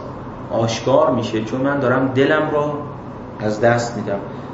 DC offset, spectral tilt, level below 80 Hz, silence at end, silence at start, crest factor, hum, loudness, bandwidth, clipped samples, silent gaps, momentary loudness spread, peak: under 0.1%; -6 dB/octave; -48 dBFS; 0 s; 0 s; 18 dB; none; -19 LUFS; 8 kHz; under 0.1%; none; 15 LU; -2 dBFS